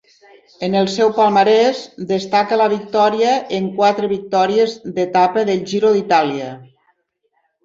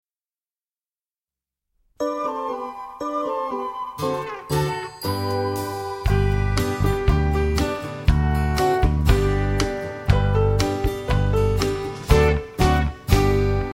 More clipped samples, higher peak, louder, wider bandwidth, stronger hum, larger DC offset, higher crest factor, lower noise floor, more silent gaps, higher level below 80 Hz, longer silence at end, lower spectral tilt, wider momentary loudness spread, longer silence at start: neither; about the same, -2 dBFS vs -2 dBFS; first, -16 LUFS vs -22 LUFS; second, 7.8 kHz vs 16.5 kHz; neither; neither; second, 14 dB vs 20 dB; second, -67 dBFS vs under -90 dBFS; neither; second, -62 dBFS vs -26 dBFS; first, 1 s vs 0 s; second, -5 dB/octave vs -6.5 dB/octave; about the same, 9 LU vs 9 LU; second, 0.6 s vs 2 s